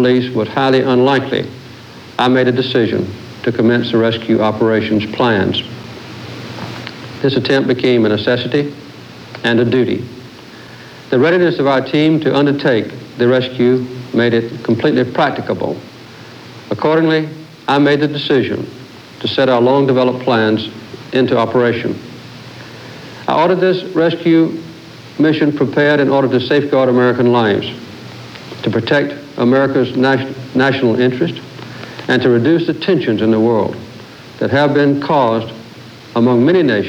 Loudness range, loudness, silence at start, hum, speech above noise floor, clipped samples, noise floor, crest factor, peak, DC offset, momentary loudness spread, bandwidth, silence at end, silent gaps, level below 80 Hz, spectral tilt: 3 LU; -14 LUFS; 0 s; none; 22 dB; under 0.1%; -35 dBFS; 14 dB; -2 dBFS; under 0.1%; 20 LU; 10 kHz; 0 s; none; -56 dBFS; -7 dB/octave